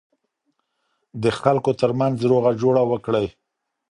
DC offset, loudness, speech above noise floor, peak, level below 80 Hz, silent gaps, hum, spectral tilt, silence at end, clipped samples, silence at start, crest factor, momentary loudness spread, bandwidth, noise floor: under 0.1%; -20 LUFS; 54 dB; 0 dBFS; -56 dBFS; none; none; -7.5 dB/octave; 0.6 s; under 0.1%; 1.15 s; 20 dB; 6 LU; 11 kHz; -73 dBFS